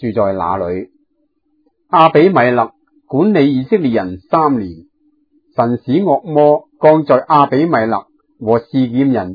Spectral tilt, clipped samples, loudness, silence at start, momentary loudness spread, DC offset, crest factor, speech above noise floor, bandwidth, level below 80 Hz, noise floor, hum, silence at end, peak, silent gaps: -10 dB/octave; 0.1%; -13 LUFS; 0 s; 11 LU; under 0.1%; 14 dB; 51 dB; 5.4 kHz; -54 dBFS; -63 dBFS; none; 0 s; 0 dBFS; none